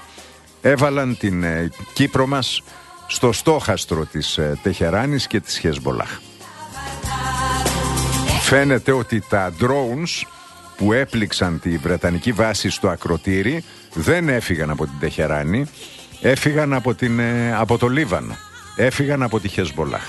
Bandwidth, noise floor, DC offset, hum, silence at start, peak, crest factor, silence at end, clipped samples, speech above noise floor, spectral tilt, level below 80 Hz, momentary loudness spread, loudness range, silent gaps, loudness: 12.5 kHz; -43 dBFS; under 0.1%; none; 0 s; -4 dBFS; 16 dB; 0 s; under 0.1%; 24 dB; -5 dB/octave; -38 dBFS; 10 LU; 3 LU; none; -19 LUFS